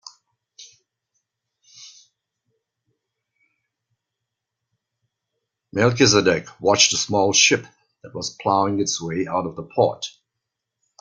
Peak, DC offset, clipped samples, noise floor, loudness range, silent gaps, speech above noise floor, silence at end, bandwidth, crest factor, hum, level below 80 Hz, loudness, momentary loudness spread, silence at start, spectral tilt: -2 dBFS; under 0.1%; under 0.1%; -82 dBFS; 6 LU; none; 63 dB; 0.9 s; 10.5 kHz; 22 dB; none; -60 dBFS; -19 LUFS; 15 LU; 0.05 s; -3 dB/octave